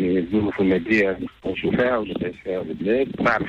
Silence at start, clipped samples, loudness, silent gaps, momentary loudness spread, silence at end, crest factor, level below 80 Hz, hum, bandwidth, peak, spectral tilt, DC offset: 0 s; under 0.1%; -22 LUFS; none; 9 LU; 0 s; 14 dB; -48 dBFS; none; 7.6 kHz; -8 dBFS; -7.5 dB/octave; under 0.1%